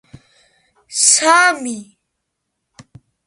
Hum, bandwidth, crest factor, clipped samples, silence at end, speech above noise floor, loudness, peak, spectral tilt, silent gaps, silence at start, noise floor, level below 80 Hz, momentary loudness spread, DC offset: none; 14.5 kHz; 20 dB; under 0.1%; 1.45 s; 61 dB; -12 LUFS; 0 dBFS; 0 dB/octave; none; 0.9 s; -75 dBFS; -64 dBFS; 17 LU; under 0.1%